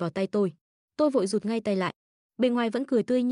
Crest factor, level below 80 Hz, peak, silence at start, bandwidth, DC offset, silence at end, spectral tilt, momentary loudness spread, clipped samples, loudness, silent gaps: 14 dB; -74 dBFS; -14 dBFS; 0 s; 11 kHz; under 0.1%; 0 s; -6 dB/octave; 5 LU; under 0.1%; -27 LUFS; 0.61-0.88 s, 1.96-2.29 s